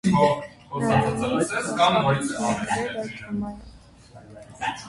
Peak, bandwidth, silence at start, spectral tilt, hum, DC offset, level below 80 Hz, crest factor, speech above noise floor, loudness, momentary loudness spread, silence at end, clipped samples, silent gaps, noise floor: -6 dBFS; 11.5 kHz; 0.05 s; -5 dB/octave; none; under 0.1%; -50 dBFS; 18 dB; 24 dB; -24 LUFS; 12 LU; 0 s; under 0.1%; none; -48 dBFS